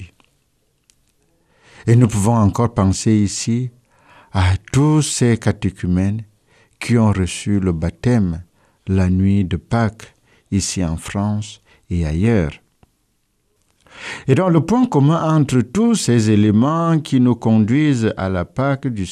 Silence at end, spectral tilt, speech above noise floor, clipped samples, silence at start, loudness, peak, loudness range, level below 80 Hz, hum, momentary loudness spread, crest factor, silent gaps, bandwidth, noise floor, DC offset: 0 s; -6.5 dB/octave; 49 dB; under 0.1%; 0 s; -17 LUFS; 0 dBFS; 6 LU; -40 dBFS; none; 9 LU; 16 dB; none; 13.5 kHz; -65 dBFS; under 0.1%